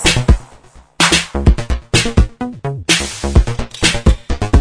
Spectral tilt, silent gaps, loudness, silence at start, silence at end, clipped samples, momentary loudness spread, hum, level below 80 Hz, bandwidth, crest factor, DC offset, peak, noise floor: -4 dB/octave; none; -15 LUFS; 0 s; 0 s; under 0.1%; 8 LU; none; -18 dBFS; 11 kHz; 14 dB; under 0.1%; 0 dBFS; -42 dBFS